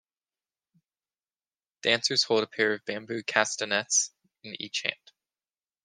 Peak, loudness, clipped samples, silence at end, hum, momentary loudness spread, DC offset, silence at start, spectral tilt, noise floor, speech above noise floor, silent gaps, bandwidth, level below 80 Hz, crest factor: -4 dBFS; -27 LUFS; under 0.1%; 0.9 s; none; 10 LU; under 0.1%; 1.85 s; -1 dB/octave; under -90 dBFS; over 62 dB; none; 10.5 kHz; -82 dBFS; 26 dB